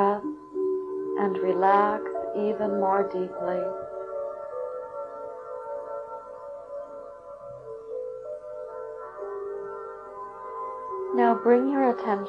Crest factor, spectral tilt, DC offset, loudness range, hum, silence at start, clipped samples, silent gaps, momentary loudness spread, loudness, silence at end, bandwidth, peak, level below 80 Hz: 20 dB; -8.5 dB/octave; under 0.1%; 12 LU; none; 0 s; under 0.1%; none; 18 LU; -28 LUFS; 0 s; 5.8 kHz; -8 dBFS; -68 dBFS